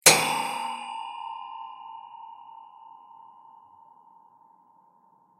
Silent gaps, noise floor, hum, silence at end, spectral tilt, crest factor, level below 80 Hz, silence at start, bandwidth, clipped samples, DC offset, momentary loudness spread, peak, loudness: none; -61 dBFS; none; 2.1 s; -0.5 dB/octave; 30 dB; -74 dBFS; 0.05 s; 15.5 kHz; under 0.1%; under 0.1%; 25 LU; 0 dBFS; -27 LUFS